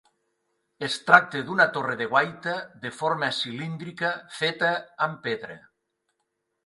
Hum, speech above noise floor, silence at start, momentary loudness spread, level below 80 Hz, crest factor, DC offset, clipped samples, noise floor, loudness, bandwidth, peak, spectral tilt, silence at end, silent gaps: none; 53 dB; 0.8 s; 15 LU; -74 dBFS; 26 dB; under 0.1%; under 0.1%; -78 dBFS; -25 LUFS; 11.5 kHz; 0 dBFS; -4 dB/octave; 1.1 s; none